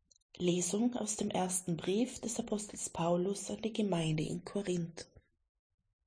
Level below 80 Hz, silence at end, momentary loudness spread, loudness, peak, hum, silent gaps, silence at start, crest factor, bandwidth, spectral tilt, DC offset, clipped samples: -64 dBFS; 1 s; 6 LU; -35 LUFS; -20 dBFS; none; none; 0.35 s; 16 dB; 10.5 kHz; -5 dB/octave; under 0.1%; under 0.1%